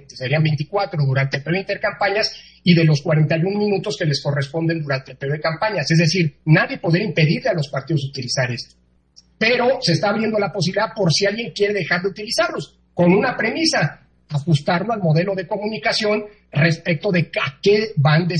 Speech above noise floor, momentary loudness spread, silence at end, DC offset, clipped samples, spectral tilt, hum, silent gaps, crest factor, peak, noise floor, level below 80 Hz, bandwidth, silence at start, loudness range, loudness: 34 dB; 7 LU; 0 s; under 0.1%; under 0.1%; -5.5 dB/octave; none; none; 18 dB; -2 dBFS; -53 dBFS; -56 dBFS; 12 kHz; 0.1 s; 2 LU; -19 LUFS